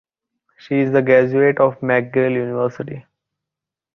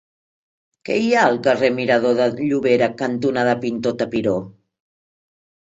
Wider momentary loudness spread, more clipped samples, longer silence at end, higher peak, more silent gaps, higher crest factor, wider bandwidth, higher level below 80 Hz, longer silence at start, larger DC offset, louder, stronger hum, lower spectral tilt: first, 13 LU vs 7 LU; neither; second, 0.95 s vs 1.15 s; about the same, -2 dBFS vs -2 dBFS; neither; about the same, 18 dB vs 18 dB; second, 6.2 kHz vs 8 kHz; about the same, -62 dBFS vs -60 dBFS; second, 0.7 s vs 0.85 s; neither; about the same, -17 LUFS vs -19 LUFS; neither; first, -9 dB/octave vs -6 dB/octave